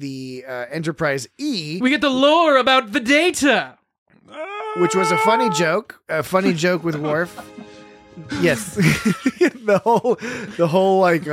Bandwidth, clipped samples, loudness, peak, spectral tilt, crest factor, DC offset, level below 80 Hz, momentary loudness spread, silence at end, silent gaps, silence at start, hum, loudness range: 16 kHz; under 0.1%; -18 LUFS; -2 dBFS; -4.5 dB/octave; 16 dB; under 0.1%; -54 dBFS; 14 LU; 0 s; 3.98-4.06 s; 0 s; none; 4 LU